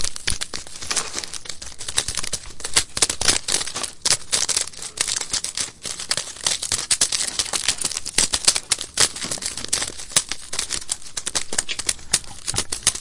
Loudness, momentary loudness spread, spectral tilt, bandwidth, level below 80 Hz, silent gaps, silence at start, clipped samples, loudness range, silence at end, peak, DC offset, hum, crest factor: -21 LUFS; 9 LU; 0.5 dB/octave; 12 kHz; -44 dBFS; none; 0 s; under 0.1%; 3 LU; 0 s; 0 dBFS; under 0.1%; none; 24 dB